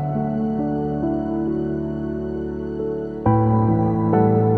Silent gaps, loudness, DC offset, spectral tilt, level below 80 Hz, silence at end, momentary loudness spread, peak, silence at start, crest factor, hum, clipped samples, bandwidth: none; -21 LUFS; 0.3%; -12 dB/octave; -40 dBFS; 0 s; 9 LU; -4 dBFS; 0 s; 16 dB; none; under 0.1%; 3.2 kHz